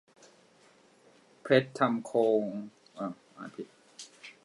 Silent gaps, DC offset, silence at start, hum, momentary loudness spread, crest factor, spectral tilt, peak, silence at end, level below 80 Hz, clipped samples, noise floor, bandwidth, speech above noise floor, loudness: none; under 0.1%; 1.45 s; none; 21 LU; 24 dB; -6 dB/octave; -8 dBFS; 0.15 s; -84 dBFS; under 0.1%; -62 dBFS; 11.5 kHz; 33 dB; -30 LUFS